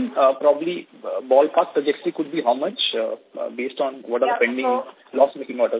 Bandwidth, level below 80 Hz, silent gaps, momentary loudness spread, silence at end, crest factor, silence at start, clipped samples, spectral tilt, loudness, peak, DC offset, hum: 4 kHz; -76 dBFS; none; 12 LU; 0 s; 18 dB; 0 s; under 0.1%; -8 dB/octave; -22 LUFS; -4 dBFS; under 0.1%; none